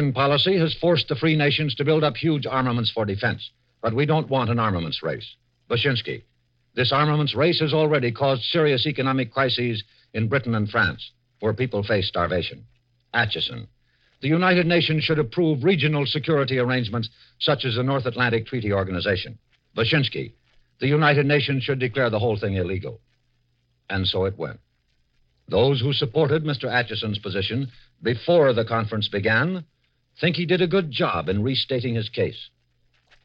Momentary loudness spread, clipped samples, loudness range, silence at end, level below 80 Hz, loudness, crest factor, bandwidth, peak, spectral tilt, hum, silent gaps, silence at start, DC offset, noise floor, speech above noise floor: 10 LU; under 0.1%; 4 LU; 0.8 s; -54 dBFS; -22 LUFS; 18 dB; 5.8 kHz; -6 dBFS; -8.5 dB/octave; none; none; 0 s; under 0.1%; -67 dBFS; 45 dB